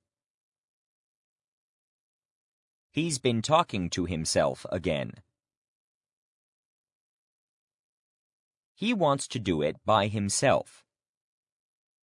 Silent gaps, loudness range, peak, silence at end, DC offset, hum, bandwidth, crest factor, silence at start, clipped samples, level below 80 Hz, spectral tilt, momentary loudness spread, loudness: 5.57-6.01 s, 6.12-6.84 s, 6.92-7.68 s, 7.74-8.51 s, 8.57-8.75 s; 11 LU; -8 dBFS; 1.4 s; under 0.1%; none; 11 kHz; 24 dB; 2.95 s; under 0.1%; -64 dBFS; -4.5 dB/octave; 8 LU; -28 LUFS